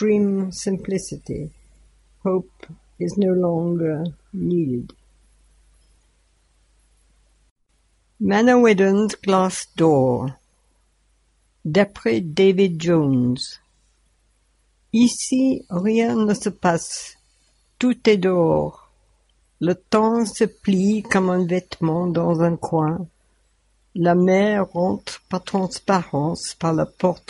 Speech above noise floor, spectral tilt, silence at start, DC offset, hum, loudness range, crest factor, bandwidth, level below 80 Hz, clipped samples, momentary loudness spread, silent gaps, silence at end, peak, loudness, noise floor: 44 dB; -6 dB/octave; 0 s; under 0.1%; none; 6 LU; 20 dB; 11.5 kHz; -54 dBFS; under 0.1%; 12 LU; 7.51-7.56 s; 0.1 s; -2 dBFS; -20 LUFS; -63 dBFS